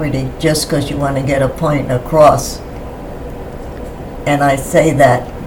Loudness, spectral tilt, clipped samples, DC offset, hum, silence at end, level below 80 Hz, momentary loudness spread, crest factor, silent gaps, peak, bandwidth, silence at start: -13 LUFS; -5.5 dB/octave; 0.3%; under 0.1%; none; 0 s; -30 dBFS; 18 LU; 14 dB; none; 0 dBFS; 18 kHz; 0 s